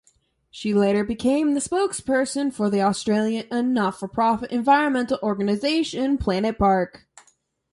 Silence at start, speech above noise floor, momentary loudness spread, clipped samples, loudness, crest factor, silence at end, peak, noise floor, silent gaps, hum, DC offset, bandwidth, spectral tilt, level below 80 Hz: 0.55 s; 42 dB; 5 LU; under 0.1%; -22 LUFS; 18 dB; 0.85 s; -4 dBFS; -64 dBFS; none; none; under 0.1%; 11.5 kHz; -5 dB/octave; -48 dBFS